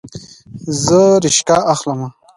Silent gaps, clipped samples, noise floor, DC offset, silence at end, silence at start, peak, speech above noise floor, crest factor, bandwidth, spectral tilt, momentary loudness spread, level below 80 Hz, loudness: none; under 0.1%; -35 dBFS; under 0.1%; 0.25 s; 0.05 s; 0 dBFS; 22 dB; 14 dB; 11.5 kHz; -4 dB/octave; 16 LU; -50 dBFS; -13 LUFS